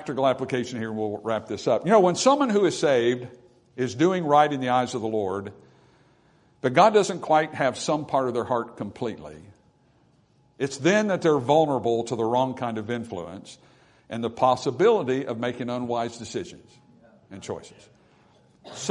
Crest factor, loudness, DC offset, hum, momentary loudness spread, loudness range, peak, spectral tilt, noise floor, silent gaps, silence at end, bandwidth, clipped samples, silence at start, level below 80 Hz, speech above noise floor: 22 dB; -24 LUFS; under 0.1%; none; 16 LU; 6 LU; -4 dBFS; -5 dB/octave; -61 dBFS; none; 0 s; 11 kHz; under 0.1%; 0 s; -66 dBFS; 38 dB